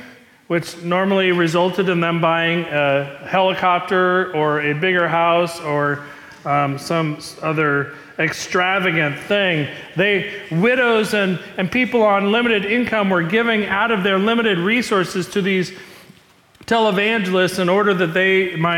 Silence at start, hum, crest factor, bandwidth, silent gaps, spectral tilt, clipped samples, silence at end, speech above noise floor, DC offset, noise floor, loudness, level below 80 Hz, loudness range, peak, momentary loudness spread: 0 s; none; 12 dB; 17 kHz; none; -5.5 dB/octave; under 0.1%; 0 s; 33 dB; under 0.1%; -51 dBFS; -18 LUFS; -58 dBFS; 2 LU; -6 dBFS; 6 LU